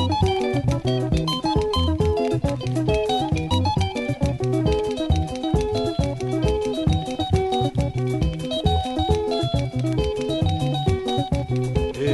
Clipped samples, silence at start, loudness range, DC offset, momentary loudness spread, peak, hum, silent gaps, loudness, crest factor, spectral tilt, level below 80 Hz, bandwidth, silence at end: under 0.1%; 0 s; 1 LU; under 0.1%; 3 LU; -6 dBFS; none; none; -23 LUFS; 16 dB; -6.5 dB/octave; -32 dBFS; 11.5 kHz; 0 s